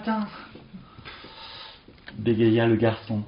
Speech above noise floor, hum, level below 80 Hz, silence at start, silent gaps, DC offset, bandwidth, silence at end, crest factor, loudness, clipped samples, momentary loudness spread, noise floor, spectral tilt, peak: 23 dB; none; -56 dBFS; 0 s; none; under 0.1%; 5.4 kHz; 0 s; 18 dB; -23 LUFS; under 0.1%; 24 LU; -46 dBFS; -6 dB/octave; -8 dBFS